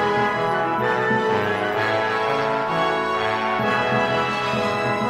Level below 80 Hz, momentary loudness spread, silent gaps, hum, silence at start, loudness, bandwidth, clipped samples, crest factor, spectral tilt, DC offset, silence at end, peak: -56 dBFS; 2 LU; none; none; 0 s; -21 LUFS; 14.5 kHz; under 0.1%; 14 dB; -5.5 dB/octave; under 0.1%; 0 s; -8 dBFS